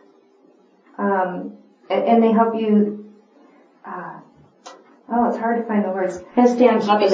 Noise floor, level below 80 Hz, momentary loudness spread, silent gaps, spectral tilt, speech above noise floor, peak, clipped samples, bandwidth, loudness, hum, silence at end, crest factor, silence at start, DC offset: -54 dBFS; -66 dBFS; 18 LU; none; -7 dB/octave; 37 dB; -2 dBFS; under 0.1%; 8 kHz; -19 LUFS; none; 0 s; 18 dB; 1 s; under 0.1%